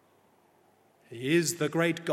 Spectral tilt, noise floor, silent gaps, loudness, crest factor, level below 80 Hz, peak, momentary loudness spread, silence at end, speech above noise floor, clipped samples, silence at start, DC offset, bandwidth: -4.5 dB/octave; -64 dBFS; none; -28 LUFS; 20 dB; -78 dBFS; -12 dBFS; 12 LU; 0 s; 37 dB; under 0.1%; 1.1 s; under 0.1%; 15.5 kHz